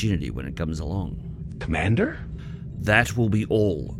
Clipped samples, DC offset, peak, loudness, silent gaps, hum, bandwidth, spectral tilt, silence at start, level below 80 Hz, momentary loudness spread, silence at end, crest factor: under 0.1%; under 0.1%; -4 dBFS; -24 LUFS; none; none; 14.5 kHz; -6.5 dB/octave; 0 s; -38 dBFS; 16 LU; 0 s; 22 dB